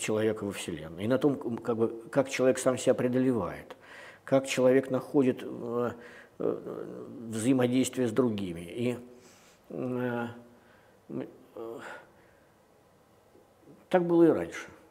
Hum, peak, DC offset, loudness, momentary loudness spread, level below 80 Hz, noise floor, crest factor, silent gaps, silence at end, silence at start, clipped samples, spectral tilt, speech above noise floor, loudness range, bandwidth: none; -8 dBFS; under 0.1%; -29 LUFS; 19 LU; -68 dBFS; -62 dBFS; 22 dB; none; 0.15 s; 0 s; under 0.1%; -5.5 dB/octave; 33 dB; 11 LU; 15.5 kHz